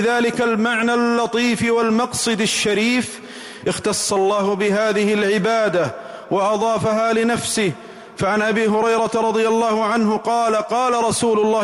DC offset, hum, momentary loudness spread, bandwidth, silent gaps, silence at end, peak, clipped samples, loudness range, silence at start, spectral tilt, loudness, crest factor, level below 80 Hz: under 0.1%; none; 6 LU; 15.5 kHz; none; 0 s; -10 dBFS; under 0.1%; 1 LU; 0 s; -4 dB/octave; -18 LUFS; 10 dB; -56 dBFS